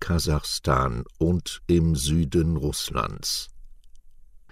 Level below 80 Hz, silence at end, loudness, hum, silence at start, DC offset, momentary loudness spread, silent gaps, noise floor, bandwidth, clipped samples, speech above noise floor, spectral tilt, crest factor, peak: -36 dBFS; 0.35 s; -25 LUFS; none; 0 s; under 0.1%; 5 LU; none; -47 dBFS; 16 kHz; under 0.1%; 23 dB; -5 dB/octave; 16 dB; -8 dBFS